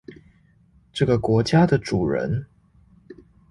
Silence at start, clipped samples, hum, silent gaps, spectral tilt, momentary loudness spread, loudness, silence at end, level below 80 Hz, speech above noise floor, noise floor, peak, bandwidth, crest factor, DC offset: 0.1 s; under 0.1%; none; none; -7 dB/octave; 10 LU; -21 LUFS; 0.35 s; -46 dBFS; 37 dB; -57 dBFS; -6 dBFS; 11.5 kHz; 18 dB; under 0.1%